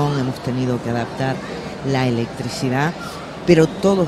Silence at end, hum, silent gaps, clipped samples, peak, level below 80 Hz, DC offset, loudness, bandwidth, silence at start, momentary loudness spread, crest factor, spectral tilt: 0 s; none; none; under 0.1%; 0 dBFS; -46 dBFS; under 0.1%; -20 LUFS; 13 kHz; 0 s; 12 LU; 20 dB; -6.5 dB/octave